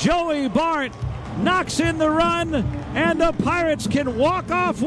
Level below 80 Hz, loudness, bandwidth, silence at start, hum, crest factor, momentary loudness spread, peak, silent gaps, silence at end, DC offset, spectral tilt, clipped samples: -38 dBFS; -21 LUFS; 11 kHz; 0 s; none; 14 dB; 6 LU; -6 dBFS; none; 0 s; under 0.1%; -5.5 dB/octave; under 0.1%